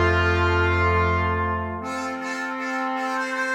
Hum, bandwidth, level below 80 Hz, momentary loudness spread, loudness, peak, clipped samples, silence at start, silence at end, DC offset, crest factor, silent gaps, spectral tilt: none; 10 kHz; -38 dBFS; 8 LU; -23 LUFS; -8 dBFS; under 0.1%; 0 s; 0 s; under 0.1%; 14 dB; none; -6 dB/octave